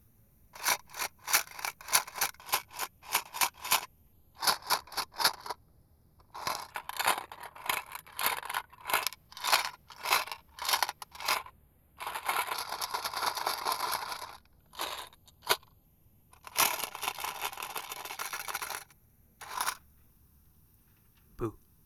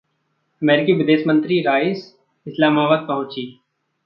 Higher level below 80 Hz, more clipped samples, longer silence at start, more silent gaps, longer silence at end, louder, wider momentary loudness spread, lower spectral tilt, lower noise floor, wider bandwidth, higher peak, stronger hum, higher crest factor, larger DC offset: about the same, -64 dBFS vs -68 dBFS; neither; about the same, 0.55 s vs 0.6 s; neither; second, 0.3 s vs 0.55 s; second, -33 LUFS vs -18 LUFS; about the same, 14 LU vs 15 LU; second, 0 dB/octave vs -8.5 dB/octave; second, -64 dBFS vs -69 dBFS; first, over 20 kHz vs 5.8 kHz; second, -6 dBFS vs -2 dBFS; neither; first, 30 dB vs 16 dB; neither